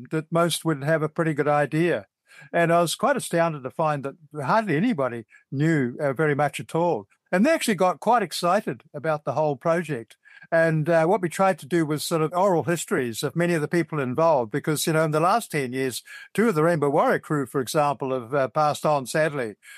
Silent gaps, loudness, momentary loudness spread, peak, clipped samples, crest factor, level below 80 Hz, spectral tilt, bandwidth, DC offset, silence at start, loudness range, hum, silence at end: none; -23 LUFS; 7 LU; -8 dBFS; under 0.1%; 14 dB; -74 dBFS; -5.5 dB/octave; 15 kHz; under 0.1%; 0 s; 2 LU; none; 0 s